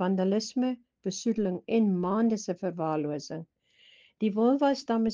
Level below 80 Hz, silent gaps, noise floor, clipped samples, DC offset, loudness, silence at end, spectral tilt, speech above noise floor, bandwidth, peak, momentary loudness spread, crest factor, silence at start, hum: -70 dBFS; none; -61 dBFS; under 0.1%; under 0.1%; -29 LUFS; 0 s; -6.5 dB/octave; 33 dB; 7.6 kHz; -14 dBFS; 10 LU; 16 dB; 0 s; none